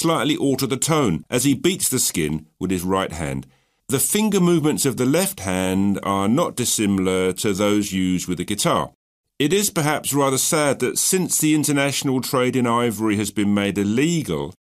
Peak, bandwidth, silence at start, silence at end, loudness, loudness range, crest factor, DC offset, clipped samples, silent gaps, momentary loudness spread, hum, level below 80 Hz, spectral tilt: -4 dBFS; 15.5 kHz; 0 s; 0.15 s; -20 LUFS; 2 LU; 16 dB; under 0.1%; under 0.1%; 8.95-9.24 s; 6 LU; none; -50 dBFS; -4 dB/octave